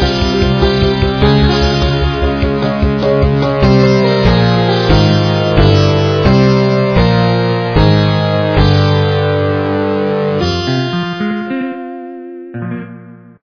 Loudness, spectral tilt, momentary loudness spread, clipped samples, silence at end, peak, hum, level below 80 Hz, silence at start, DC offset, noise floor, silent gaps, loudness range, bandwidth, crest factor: -12 LUFS; -7.5 dB/octave; 11 LU; under 0.1%; 0.25 s; 0 dBFS; none; -22 dBFS; 0 s; under 0.1%; -34 dBFS; none; 6 LU; 5.4 kHz; 12 dB